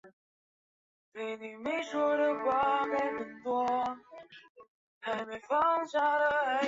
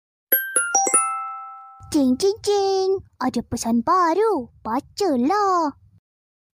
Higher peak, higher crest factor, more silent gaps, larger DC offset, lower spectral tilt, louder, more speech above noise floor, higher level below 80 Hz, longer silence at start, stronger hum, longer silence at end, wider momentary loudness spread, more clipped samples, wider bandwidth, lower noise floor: second, -18 dBFS vs -6 dBFS; about the same, 16 dB vs 16 dB; first, 0.13-1.12 s, 4.49-4.55 s, 4.68-5.01 s vs none; neither; first, -4 dB/octave vs -2.5 dB/octave; second, -31 LUFS vs -21 LUFS; first, over 59 dB vs 19 dB; second, -72 dBFS vs -54 dBFS; second, 0.05 s vs 0.3 s; neither; second, 0 s vs 0.85 s; first, 13 LU vs 9 LU; neither; second, 7.8 kHz vs 16 kHz; first, under -90 dBFS vs -40 dBFS